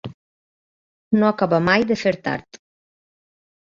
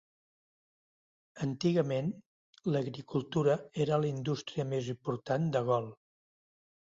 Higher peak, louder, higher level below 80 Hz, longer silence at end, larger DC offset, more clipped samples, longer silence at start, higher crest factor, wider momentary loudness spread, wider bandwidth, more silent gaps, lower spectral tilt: first, -4 dBFS vs -16 dBFS; first, -19 LUFS vs -33 LUFS; first, -56 dBFS vs -70 dBFS; first, 1.15 s vs 0.9 s; neither; neither; second, 0.05 s vs 1.35 s; about the same, 20 dB vs 18 dB; first, 11 LU vs 8 LU; about the same, 7.4 kHz vs 7.8 kHz; first, 0.14-1.11 s vs 2.26-2.53 s; about the same, -6.5 dB/octave vs -7 dB/octave